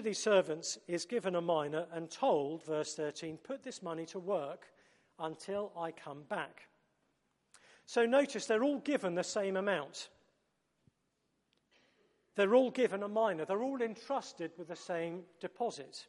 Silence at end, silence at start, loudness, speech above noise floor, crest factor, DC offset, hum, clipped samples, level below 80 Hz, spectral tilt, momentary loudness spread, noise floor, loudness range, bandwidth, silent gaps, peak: 0.05 s; 0 s; -36 LUFS; 46 dB; 20 dB; under 0.1%; none; under 0.1%; -86 dBFS; -4 dB/octave; 14 LU; -81 dBFS; 7 LU; 11.5 kHz; none; -16 dBFS